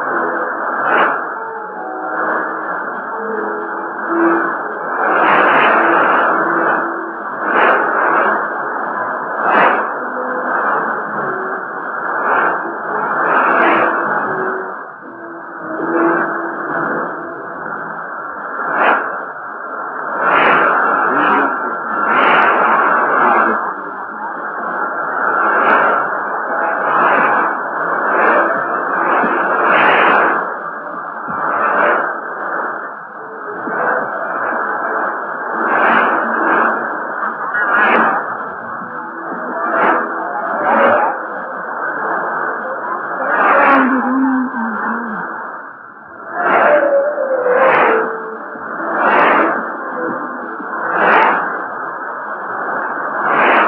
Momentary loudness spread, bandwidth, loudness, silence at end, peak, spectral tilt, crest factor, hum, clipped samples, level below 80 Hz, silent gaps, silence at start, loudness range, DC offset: 13 LU; 5.4 kHz; -15 LUFS; 0 s; 0 dBFS; -7.5 dB/octave; 16 dB; none; under 0.1%; -62 dBFS; none; 0 s; 6 LU; under 0.1%